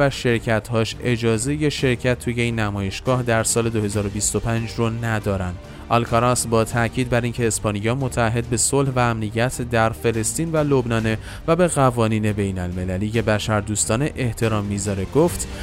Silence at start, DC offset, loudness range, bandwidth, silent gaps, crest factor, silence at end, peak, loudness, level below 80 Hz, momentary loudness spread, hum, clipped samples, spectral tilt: 0 s; under 0.1%; 1 LU; 16 kHz; none; 16 dB; 0 s; -4 dBFS; -21 LUFS; -38 dBFS; 6 LU; none; under 0.1%; -5 dB/octave